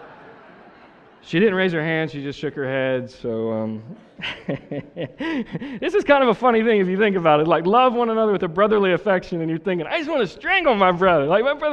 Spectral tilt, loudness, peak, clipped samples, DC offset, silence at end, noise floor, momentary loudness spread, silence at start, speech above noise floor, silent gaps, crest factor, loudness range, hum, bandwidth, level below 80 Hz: -7 dB/octave; -20 LUFS; -4 dBFS; under 0.1%; under 0.1%; 0 s; -48 dBFS; 13 LU; 0 s; 29 dB; none; 18 dB; 9 LU; none; 8.2 kHz; -54 dBFS